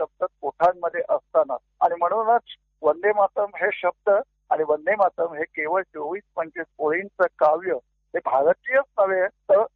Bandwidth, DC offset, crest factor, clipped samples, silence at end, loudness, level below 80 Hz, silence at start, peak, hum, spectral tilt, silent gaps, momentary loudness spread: 4.7 kHz; under 0.1%; 16 dB; under 0.1%; 0.1 s; -23 LUFS; -70 dBFS; 0 s; -8 dBFS; none; -7 dB/octave; none; 9 LU